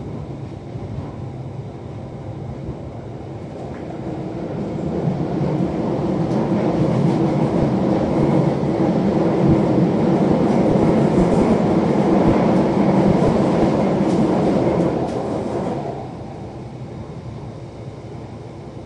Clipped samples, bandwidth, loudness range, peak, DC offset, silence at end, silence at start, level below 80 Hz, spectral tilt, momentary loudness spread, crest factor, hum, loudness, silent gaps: under 0.1%; 10.5 kHz; 14 LU; -4 dBFS; under 0.1%; 0 s; 0 s; -40 dBFS; -8.5 dB/octave; 16 LU; 16 dB; none; -18 LUFS; none